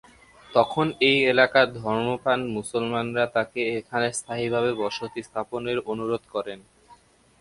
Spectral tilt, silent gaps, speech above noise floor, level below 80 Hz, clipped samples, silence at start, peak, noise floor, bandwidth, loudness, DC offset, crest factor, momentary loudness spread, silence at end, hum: -4.5 dB/octave; none; 31 dB; -60 dBFS; under 0.1%; 0.5 s; -4 dBFS; -55 dBFS; 11.5 kHz; -24 LUFS; under 0.1%; 22 dB; 13 LU; 0.45 s; none